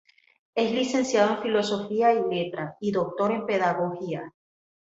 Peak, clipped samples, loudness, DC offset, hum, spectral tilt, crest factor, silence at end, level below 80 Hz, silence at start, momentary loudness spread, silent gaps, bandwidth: -6 dBFS; under 0.1%; -26 LUFS; under 0.1%; none; -5 dB/octave; 20 dB; 0.6 s; -68 dBFS; 0.55 s; 11 LU; none; 8 kHz